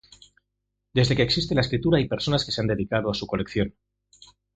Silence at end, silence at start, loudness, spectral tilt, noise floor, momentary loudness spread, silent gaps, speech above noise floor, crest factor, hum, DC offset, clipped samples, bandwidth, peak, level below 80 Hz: 0.85 s; 0.95 s; -24 LUFS; -6 dB/octave; -80 dBFS; 7 LU; none; 57 dB; 20 dB; 50 Hz at -40 dBFS; under 0.1%; under 0.1%; 9 kHz; -6 dBFS; -46 dBFS